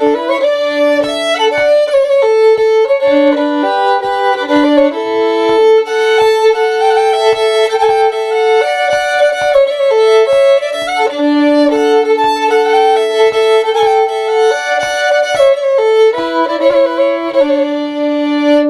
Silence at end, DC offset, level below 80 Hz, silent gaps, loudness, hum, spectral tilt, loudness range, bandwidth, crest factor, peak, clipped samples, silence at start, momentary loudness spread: 0 s; under 0.1%; -52 dBFS; none; -11 LUFS; none; -3 dB/octave; 1 LU; 12.5 kHz; 10 dB; 0 dBFS; under 0.1%; 0 s; 4 LU